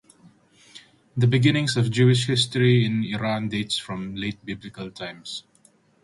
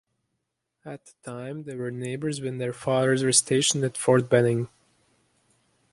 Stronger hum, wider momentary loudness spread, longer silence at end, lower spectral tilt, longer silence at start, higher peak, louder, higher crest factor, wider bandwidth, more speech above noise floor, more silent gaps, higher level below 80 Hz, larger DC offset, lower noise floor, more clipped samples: neither; second, 16 LU vs 20 LU; second, 0.65 s vs 1.25 s; first, -5.5 dB/octave vs -4 dB/octave; about the same, 0.75 s vs 0.85 s; about the same, -6 dBFS vs -4 dBFS; about the same, -22 LUFS vs -24 LUFS; about the same, 18 dB vs 22 dB; about the same, 11.5 kHz vs 11.5 kHz; second, 37 dB vs 55 dB; neither; first, -56 dBFS vs -66 dBFS; neither; second, -59 dBFS vs -80 dBFS; neither